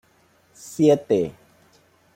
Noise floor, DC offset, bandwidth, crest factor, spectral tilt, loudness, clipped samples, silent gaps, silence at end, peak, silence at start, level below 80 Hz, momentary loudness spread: -60 dBFS; under 0.1%; 16.5 kHz; 20 dB; -6.5 dB/octave; -21 LUFS; under 0.1%; none; 0.85 s; -4 dBFS; 0.65 s; -64 dBFS; 19 LU